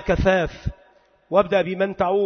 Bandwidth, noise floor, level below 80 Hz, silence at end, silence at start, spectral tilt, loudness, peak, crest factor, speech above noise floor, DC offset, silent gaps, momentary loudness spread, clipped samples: 6.6 kHz; -56 dBFS; -36 dBFS; 0 s; 0 s; -7 dB/octave; -21 LUFS; -4 dBFS; 18 dB; 36 dB; under 0.1%; none; 12 LU; under 0.1%